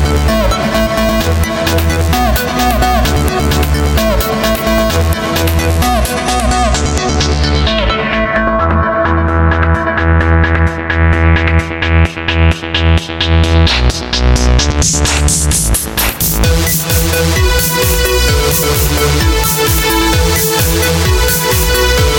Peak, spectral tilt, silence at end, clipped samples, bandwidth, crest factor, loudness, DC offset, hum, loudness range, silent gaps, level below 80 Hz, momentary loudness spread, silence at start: 0 dBFS; -4 dB/octave; 0 s; under 0.1%; 17.5 kHz; 10 dB; -11 LUFS; under 0.1%; none; 2 LU; none; -16 dBFS; 3 LU; 0 s